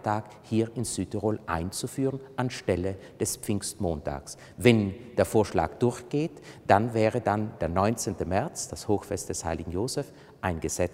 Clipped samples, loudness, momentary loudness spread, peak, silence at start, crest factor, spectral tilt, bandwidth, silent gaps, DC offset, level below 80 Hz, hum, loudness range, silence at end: under 0.1%; -28 LUFS; 10 LU; -4 dBFS; 0 s; 24 dB; -5.5 dB/octave; 16 kHz; none; under 0.1%; -50 dBFS; none; 5 LU; 0 s